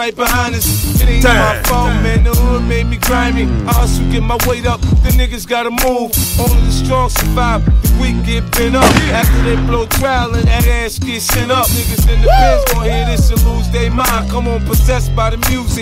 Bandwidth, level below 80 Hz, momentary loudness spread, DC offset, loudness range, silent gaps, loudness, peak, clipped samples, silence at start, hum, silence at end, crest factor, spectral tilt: 16.5 kHz; -14 dBFS; 5 LU; under 0.1%; 1 LU; none; -13 LUFS; 0 dBFS; under 0.1%; 0 s; none; 0 s; 12 dB; -4.5 dB/octave